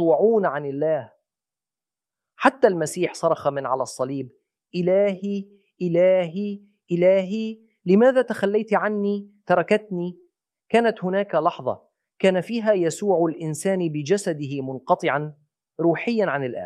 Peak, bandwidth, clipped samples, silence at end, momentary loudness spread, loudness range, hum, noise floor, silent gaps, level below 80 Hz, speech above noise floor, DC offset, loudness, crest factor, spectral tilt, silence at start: -2 dBFS; 13 kHz; under 0.1%; 0 s; 12 LU; 3 LU; none; under -90 dBFS; none; -74 dBFS; over 68 dB; under 0.1%; -22 LUFS; 22 dB; -6 dB/octave; 0 s